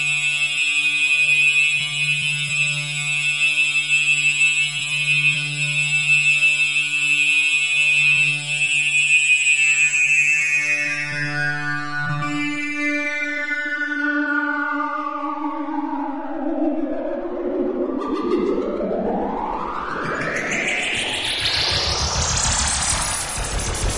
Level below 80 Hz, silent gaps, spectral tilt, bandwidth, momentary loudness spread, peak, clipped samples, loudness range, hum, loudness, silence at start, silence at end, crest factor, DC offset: -40 dBFS; none; -2 dB/octave; 11.5 kHz; 11 LU; -6 dBFS; under 0.1%; 9 LU; none; -18 LUFS; 0 s; 0 s; 14 dB; under 0.1%